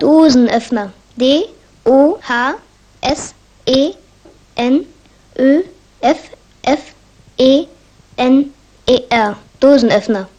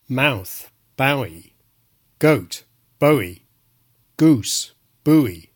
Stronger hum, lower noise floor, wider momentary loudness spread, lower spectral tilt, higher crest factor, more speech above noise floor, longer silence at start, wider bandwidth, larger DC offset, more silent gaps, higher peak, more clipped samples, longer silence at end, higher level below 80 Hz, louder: neither; second, -45 dBFS vs -62 dBFS; about the same, 16 LU vs 17 LU; about the same, -4.5 dB/octave vs -5 dB/octave; about the same, 14 dB vs 18 dB; second, 33 dB vs 44 dB; about the same, 0 s vs 0.1 s; second, 9.4 kHz vs 18 kHz; neither; neither; about the same, 0 dBFS vs -2 dBFS; neither; about the same, 0.1 s vs 0.15 s; first, -46 dBFS vs -58 dBFS; first, -14 LUFS vs -19 LUFS